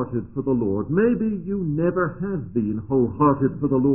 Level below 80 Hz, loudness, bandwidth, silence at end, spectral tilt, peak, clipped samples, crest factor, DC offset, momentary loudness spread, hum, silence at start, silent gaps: -48 dBFS; -23 LUFS; 3 kHz; 0 s; -14 dB/octave; -6 dBFS; under 0.1%; 16 dB; 0.4%; 7 LU; none; 0 s; none